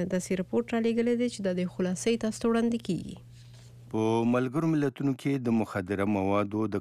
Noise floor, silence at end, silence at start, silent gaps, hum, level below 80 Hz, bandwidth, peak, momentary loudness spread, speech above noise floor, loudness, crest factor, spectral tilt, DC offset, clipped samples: -49 dBFS; 0 s; 0 s; none; none; -62 dBFS; 13.5 kHz; -16 dBFS; 5 LU; 21 dB; -29 LUFS; 14 dB; -6.5 dB/octave; under 0.1%; under 0.1%